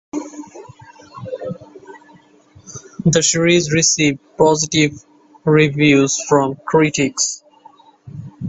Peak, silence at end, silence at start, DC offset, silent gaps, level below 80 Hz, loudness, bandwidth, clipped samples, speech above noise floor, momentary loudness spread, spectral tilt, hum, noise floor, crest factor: 0 dBFS; 0 s; 0.15 s; under 0.1%; none; -52 dBFS; -15 LUFS; 8.4 kHz; under 0.1%; 33 dB; 22 LU; -4 dB/octave; none; -48 dBFS; 18 dB